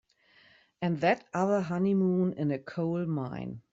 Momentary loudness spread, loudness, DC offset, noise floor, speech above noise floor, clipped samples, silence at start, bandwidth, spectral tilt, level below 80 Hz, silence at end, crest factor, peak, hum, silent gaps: 8 LU; -30 LUFS; under 0.1%; -62 dBFS; 33 dB; under 0.1%; 0.8 s; 7.8 kHz; -8 dB/octave; -68 dBFS; 0.15 s; 18 dB; -12 dBFS; none; none